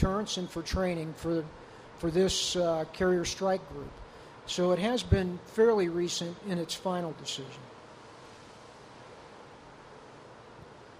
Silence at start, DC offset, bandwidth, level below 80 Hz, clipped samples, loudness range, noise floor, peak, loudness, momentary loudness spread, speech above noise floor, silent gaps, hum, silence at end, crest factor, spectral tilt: 0 s; under 0.1%; 15.5 kHz; -48 dBFS; under 0.1%; 15 LU; -51 dBFS; -10 dBFS; -30 LUFS; 23 LU; 21 dB; none; none; 0 s; 22 dB; -5 dB/octave